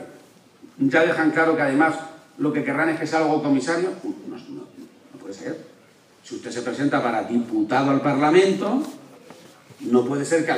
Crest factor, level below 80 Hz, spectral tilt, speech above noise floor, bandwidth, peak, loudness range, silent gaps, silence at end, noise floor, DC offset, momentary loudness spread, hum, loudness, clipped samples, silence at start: 18 dB; -76 dBFS; -5.5 dB/octave; 33 dB; 12 kHz; -4 dBFS; 8 LU; none; 0 s; -53 dBFS; under 0.1%; 19 LU; none; -21 LUFS; under 0.1%; 0 s